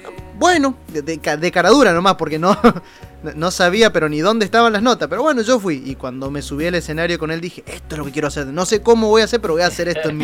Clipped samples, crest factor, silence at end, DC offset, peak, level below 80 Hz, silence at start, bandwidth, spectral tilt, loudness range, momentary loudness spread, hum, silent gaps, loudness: under 0.1%; 16 dB; 0 s; under 0.1%; -2 dBFS; -40 dBFS; 0.05 s; 16.5 kHz; -4.5 dB/octave; 6 LU; 14 LU; none; none; -16 LUFS